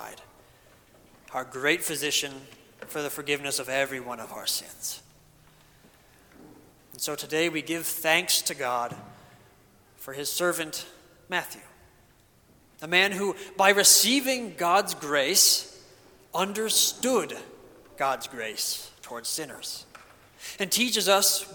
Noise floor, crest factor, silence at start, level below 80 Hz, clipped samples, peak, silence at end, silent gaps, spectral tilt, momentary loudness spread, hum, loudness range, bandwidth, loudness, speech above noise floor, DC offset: -60 dBFS; 24 dB; 0 s; -68 dBFS; under 0.1%; -4 dBFS; 0 s; none; -1 dB/octave; 19 LU; none; 12 LU; 19 kHz; -25 LUFS; 33 dB; under 0.1%